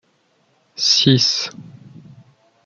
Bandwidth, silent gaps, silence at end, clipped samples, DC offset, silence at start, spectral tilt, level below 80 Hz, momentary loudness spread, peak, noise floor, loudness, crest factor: 7.2 kHz; none; 0.75 s; under 0.1%; under 0.1%; 0.8 s; -3.5 dB/octave; -60 dBFS; 16 LU; -2 dBFS; -62 dBFS; -15 LUFS; 20 dB